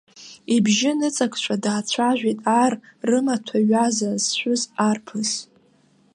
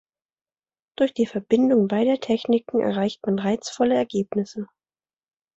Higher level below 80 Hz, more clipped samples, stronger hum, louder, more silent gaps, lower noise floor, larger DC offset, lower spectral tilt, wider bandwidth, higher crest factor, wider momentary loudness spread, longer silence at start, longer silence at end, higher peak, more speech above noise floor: second, -72 dBFS vs -64 dBFS; neither; neither; about the same, -21 LUFS vs -23 LUFS; neither; second, -58 dBFS vs under -90 dBFS; neither; second, -3.5 dB/octave vs -6.5 dB/octave; first, 11.5 kHz vs 8.2 kHz; about the same, 16 dB vs 18 dB; about the same, 6 LU vs 8 LU; second, 0.15 s vs 1 s; second, 0.7 s vs 0.95 s; about the same, -6 dBFS vs -6 dBFS; second, 37 dB vs over 68 dB